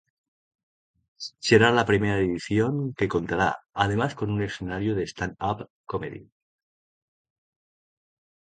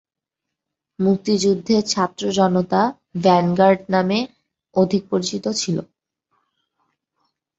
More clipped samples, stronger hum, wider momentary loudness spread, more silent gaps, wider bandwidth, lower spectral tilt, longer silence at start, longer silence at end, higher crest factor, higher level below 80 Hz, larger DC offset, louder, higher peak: neither; neither; first, 15 LU vs 7 LU; first, 5.70-5.84 s vs none; first, 9.2 kHz vs 8.2 kHz; about the same, -6 dB/octave vs -5.5 dB/octave; first, 1.2 s vs 1 s; first, 2.25 s vs 1.75 s; first, 24 dB vs 18 dB; first, -52 dBFS vs -60 dBFS; neither; second, -25 LUFS vs -19 LUFS; about the same, -4 dBFS vs -2 dBFS